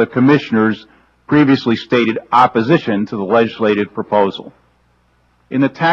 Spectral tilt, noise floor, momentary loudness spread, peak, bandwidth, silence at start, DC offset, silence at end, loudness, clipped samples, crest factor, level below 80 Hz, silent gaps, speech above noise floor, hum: -7.5 dB/octave; -56 dBFS; 7 LU; 0 dBFS; 7.2 kHz; 0 s; under 0.1%; 0 s; -14 LUFS; under 0.1%; 14 dB; -54 dBFS; none; 43 dB; 60 Hz at -50 dBFS